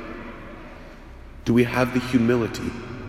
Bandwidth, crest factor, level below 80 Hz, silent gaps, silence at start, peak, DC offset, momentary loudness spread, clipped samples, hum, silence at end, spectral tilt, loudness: 15 kHz; 18 dB; -44 dBFS; none; 0 s; -6 dBFS; under 0.1%; 23 LU; under 0.1%; none; 0 s; -6.5 dB/octave; -22 LUFS